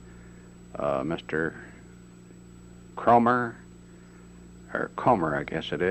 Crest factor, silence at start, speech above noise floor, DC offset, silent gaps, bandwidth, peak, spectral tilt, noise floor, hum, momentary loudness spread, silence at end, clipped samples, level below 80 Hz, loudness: 20 dB; 0 s; 23 dB; under 0.1%; none; 8.4 kHz; -8 dBFS; -7 dB/octave; -49 dBFS; 60 Hz at -55 dBFS; 27 LU; 0 s; under 0.1%; -54 dBFS; -26 LUFS